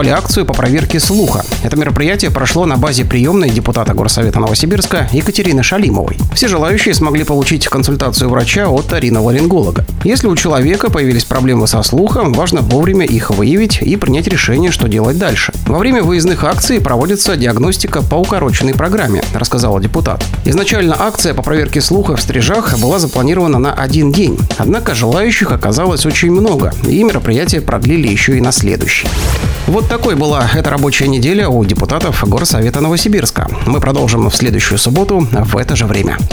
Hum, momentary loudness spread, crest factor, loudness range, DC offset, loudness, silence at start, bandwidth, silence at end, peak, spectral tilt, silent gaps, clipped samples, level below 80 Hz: none; 3 LU; 10 dB; 1 LU; under 0.1%; -11 LUFS; 0 s; over 20 kHz; 0 s; 0 dBFS; -5 dB/octave; none; under 0.1%; -22 dBFS